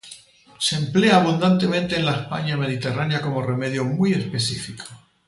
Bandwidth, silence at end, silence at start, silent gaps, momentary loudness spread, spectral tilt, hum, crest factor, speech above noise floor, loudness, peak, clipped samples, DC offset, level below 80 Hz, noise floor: 11.5 kHz; 0.3 s; 0.05 s; none; 11 LU; -5.5 dB/octave; none; 18 dB; 25 dB; -21 LUFS; -4 dBFS; under 0.1%; under 0.1%; -56 dBFS; -46 dBFS